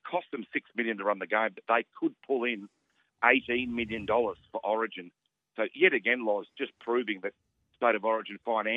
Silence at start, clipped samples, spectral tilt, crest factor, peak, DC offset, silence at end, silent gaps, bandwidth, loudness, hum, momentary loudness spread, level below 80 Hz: 0.05 s; under 0.1%; -7 dB/octave; 24 dB; -6 dBFS; under 0.1%; 0 s; none; 4 kHz; -30 LUFS; none; 11 LU; -68 dBFS